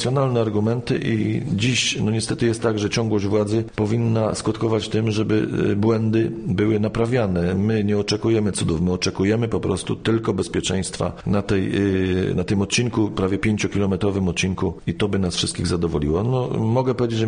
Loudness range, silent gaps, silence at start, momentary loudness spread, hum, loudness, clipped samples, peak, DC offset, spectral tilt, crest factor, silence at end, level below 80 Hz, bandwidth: 1 LU; none; 0 s; 3 LU; none; -21 LUFS; under 0.1%; -6 dBFS; under 0.1%; -5.5 dB/octave; 14 dB; 0 s; -42 dBFS; 10 kHz